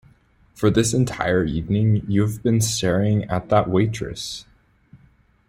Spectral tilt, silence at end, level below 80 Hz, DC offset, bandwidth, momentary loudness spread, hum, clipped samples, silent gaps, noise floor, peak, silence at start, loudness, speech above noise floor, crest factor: -5.5 dB/octave; 0.55 s; -44 dBFS; under 0.1%; 15.5 kHz; 10 LU; none; under 0.1%; none; -56 dBFS; -4 dBFS; 0.6 s; -21 LUFS; 36 dB; 18 dB